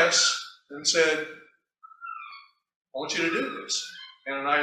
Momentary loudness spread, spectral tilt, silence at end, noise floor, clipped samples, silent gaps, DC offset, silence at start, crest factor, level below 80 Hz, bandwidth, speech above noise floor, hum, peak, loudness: 19 LU; -0.5 dB/octave; 0 s; -55 dBFS; under 0.1%; 2.76-2.81 s; under 0.1%; 0 s; 20 dB; -76 dBFS; 14.5 kHz; 28 dB; none; -8 dBFS; -26 LUFS